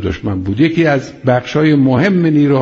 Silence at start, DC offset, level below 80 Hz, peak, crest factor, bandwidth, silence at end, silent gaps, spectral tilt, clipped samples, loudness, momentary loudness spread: 0 s; under 0.1%; -40 dBFS; 0 dBFS; 12 dB; 7.4 kHz; 0 s; none; -6.5 dB/octave; under 0.1%; -13 LUFS; 7 LU